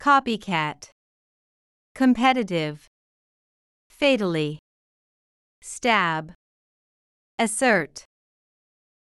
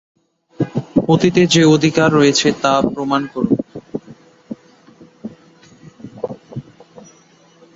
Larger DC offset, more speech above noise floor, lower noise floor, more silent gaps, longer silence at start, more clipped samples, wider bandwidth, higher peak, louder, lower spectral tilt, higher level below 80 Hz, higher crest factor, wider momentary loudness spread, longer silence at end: neither; first, over 68 dB vs 36 dB; first, under -90 dBFS vs -50 dBFS; first, 0.92-1.95 s, 2.87-3.90 s, 4.59-5.62 s, 6.35-7.38 s vs none; second, 0 s vs 0.6 s; neither; first, 12 kHz vs 7.8 kHz; second, -6 dBFS vs 0 dBFS; second, -23 LUFS vs -15 LUFS; about the same, -4 dB/octave vs -5 dB/octave; second, -62 dBFS vs -50 dBFS; about the same, 20 dB vs 18 dB; about the same, 22 LU vs 23 LU; about the same, 1.05 s vs 1.15 s